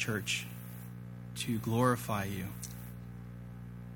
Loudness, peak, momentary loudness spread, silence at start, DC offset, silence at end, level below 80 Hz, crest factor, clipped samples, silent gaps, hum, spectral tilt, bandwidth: -36 LUFS; -14 dBFS; 17 LU; 0 s; under 0.1%; 0 s; -58 dBFS; 22 dB; under 0.1%; none; 60 Hz at -45 dBFS; -5 dB/octave; 19.5 kHz